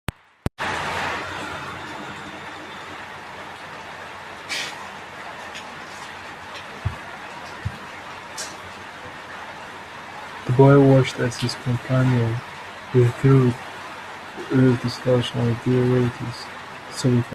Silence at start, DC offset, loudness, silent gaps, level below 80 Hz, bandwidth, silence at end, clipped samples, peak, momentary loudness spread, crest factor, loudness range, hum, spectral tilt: 0.6 s; under 0.1%; -22 LUFS; none; -50 dBFS; 13 kHz; 0 s; under 0.1%; -2 dBFS; 18 LU; 22 dB; 14 LU; none; -6.5 dB/octave